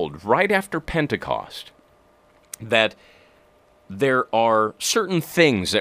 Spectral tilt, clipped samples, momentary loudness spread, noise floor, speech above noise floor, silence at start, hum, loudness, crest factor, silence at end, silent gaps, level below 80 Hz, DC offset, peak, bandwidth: -4 dB/octave; under 0.1%; 18 LU; -57 dBFS; 35 dB; 0 s; none; -21 LUFS; 22 dB; 0 s; none; -50 dBFS; under 0.1%; 0 dBFS; 15.5 kHz